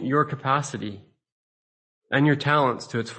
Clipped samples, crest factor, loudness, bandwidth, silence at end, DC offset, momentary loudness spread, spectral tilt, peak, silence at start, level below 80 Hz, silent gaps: under 0.1%; 18 dB; -23 LUFS; 8.8 kHz; 0 s; under 0.1%; 12 LU; -6 dB/octave; -6 dBFS; 0 s; -66 dBFS; 1.32-2.01 s